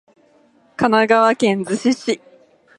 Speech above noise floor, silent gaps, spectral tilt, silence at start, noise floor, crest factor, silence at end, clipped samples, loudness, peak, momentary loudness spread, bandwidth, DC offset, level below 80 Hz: 39 dB; none; -5 dB/octave; 0.8 s; -55 dBFS; 18 dB; 0.6 s; under 0.1%; -17 LUFS; 0 dBFS; 11 LU; 11 kHz; under 0.1%; -62 dBFS